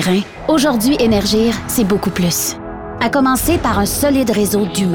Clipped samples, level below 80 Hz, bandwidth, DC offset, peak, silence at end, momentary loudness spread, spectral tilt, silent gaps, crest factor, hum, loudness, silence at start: under 0.1%; -34 dBFS; over 20 kHz; under 0.1%; -2 dBFS; 0 s; 5 LU; -4.5 dB/octave; none; 12 dB; none; -15 LUFS; 0 s